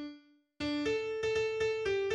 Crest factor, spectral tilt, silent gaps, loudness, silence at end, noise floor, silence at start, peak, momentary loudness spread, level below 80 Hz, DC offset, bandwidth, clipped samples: 12 dB; -4.5 dB/octave; none; -34 LUFS; 0 s; -57 dBFS; 0 s; -22 dBFS; 6 LU; -60 dBFS; under 0.1%; 9.8 kHz; under 0.1%